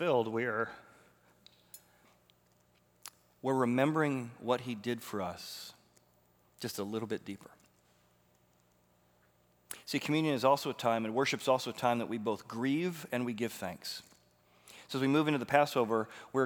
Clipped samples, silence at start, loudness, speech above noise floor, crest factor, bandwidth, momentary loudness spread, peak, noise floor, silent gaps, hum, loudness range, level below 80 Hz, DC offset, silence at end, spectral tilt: under 0.1%; 0 s; -33 LUFS; 37 dB; 24 dB; over 20 kHz; 20 LU; -10 dBFS; -70 dBFS; none; 60 Hz at -65 dBFS; 12 LU; -80 dBFS; under 0.1%; 0 s; -5 dB/octave